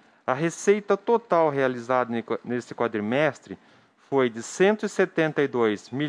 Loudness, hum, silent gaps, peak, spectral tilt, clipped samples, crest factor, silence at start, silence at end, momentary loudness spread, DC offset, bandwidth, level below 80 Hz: -24 LUFS; none; none; -6 dBFS; -5.5 dB/octave; under 0.1%; 18 dB; 0.3 s; 0 s; 7 LU; under 0.1%; 10.5 kHz; -74 dBFS